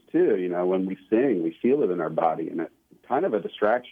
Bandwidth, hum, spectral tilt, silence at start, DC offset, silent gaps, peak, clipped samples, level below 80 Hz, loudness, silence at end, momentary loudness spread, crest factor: 3.8 kHz; none; -9 dB/octave; 0.15 s; under 0.1%; none; -10 dBFS; under 0.1%; -74 dBFS; -25 LUFS; 0 s; 7 LU; 16 dB